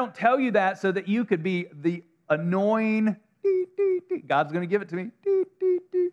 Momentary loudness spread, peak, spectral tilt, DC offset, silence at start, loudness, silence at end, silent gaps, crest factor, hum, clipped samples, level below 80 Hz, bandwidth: 6 LU; -6 dBFS; -8 dB/octave; under 0.1%; 0 s; -26 LUFS; 0 s; none; 18 dB; none; under 0.1%; -86 dBFS; 7.6 kHz